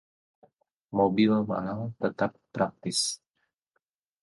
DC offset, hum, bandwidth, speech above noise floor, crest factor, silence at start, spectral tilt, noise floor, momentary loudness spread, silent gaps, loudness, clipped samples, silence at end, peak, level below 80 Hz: under 0.1%; none; 11.5 kHz; 52 dB; 18 dB; 0.9 s; -4.5 dB/octave; -80 dBFS; 9 LU; none; -28 LUFS; under 0.1%; 1.05 s; -12 dBFS; -64 dBFS